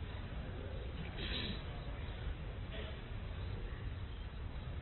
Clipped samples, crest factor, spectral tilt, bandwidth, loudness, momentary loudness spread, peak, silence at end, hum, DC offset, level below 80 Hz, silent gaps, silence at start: under 0.1%; 14 dB; -4.5 dB/octave; 4.3 kHz; -45 LUFS; 6 LU; -28 dBFS; 0 s; none; under 0.1%; -46 dBFS; none; 0 s